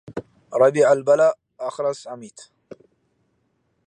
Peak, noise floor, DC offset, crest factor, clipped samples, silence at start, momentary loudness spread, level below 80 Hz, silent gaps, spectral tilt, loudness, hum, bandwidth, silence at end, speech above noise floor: -4 dBFS; -69 dBFS; under 0.1%; 18 dB; under 0.1%; 0.1 s; 21 LU; -68 dBFS; none; -5.5 dB/octave; -19 LUFS; none; 10.5 kHz; 1.6 s; 50 dB